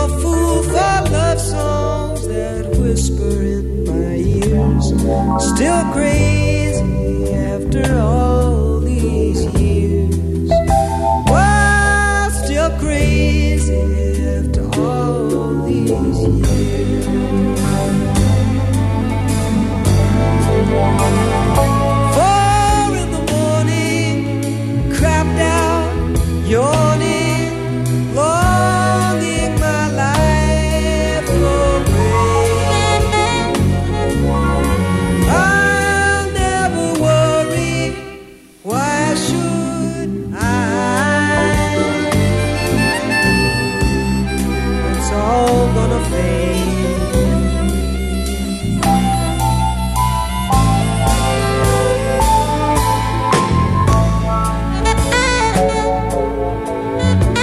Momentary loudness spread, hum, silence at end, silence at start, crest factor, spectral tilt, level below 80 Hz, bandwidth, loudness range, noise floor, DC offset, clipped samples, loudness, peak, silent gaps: 5 LU; none; 0 s; 0 s; 14 dB; -5.5 dB/octave; -22 dBFS; 14.5 kHz; 3 LU; -38 dBFS; under 0.1%; under 0.1%; -15 LUFS; 0 dBFS; none